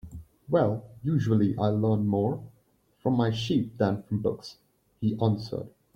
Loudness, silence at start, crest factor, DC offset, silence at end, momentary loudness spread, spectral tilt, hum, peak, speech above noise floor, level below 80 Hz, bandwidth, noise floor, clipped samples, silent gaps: -28 LUFS; 0.05 s; 16 dB; under 0.1%; 0.3 s; 13 LU; -8.5 dB/octave; none; -10 dBFS; 40 dB; -58 dBFS; 8 kHz; -66 dBFS; under 0.1%; none